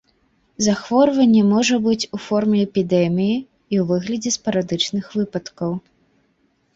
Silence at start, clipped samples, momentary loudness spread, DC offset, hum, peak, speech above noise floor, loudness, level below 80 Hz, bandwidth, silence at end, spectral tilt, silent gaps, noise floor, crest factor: 0.6 s; under 0.1%; 11 LU; under 0.1%; none; -4 dBFS; 46 dB; -19 LUFS; -58 dBFS; 8 kHz; 0.95 s; -5 dB/octave; none; -64 dBFS; 16 dB